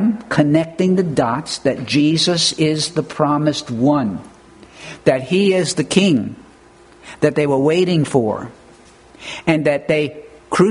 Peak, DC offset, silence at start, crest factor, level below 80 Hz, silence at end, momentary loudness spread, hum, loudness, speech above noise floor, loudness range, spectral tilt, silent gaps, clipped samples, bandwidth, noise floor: 0 dBFS; under 0.1%; 0 s; 18 dB; -52 dBFS; 0 s; 10 LU; none; -17 LUFS; 29 dB; 2 LU; -5 dB/octave; none; under 0.1%; 11 kHz; -46 dBFS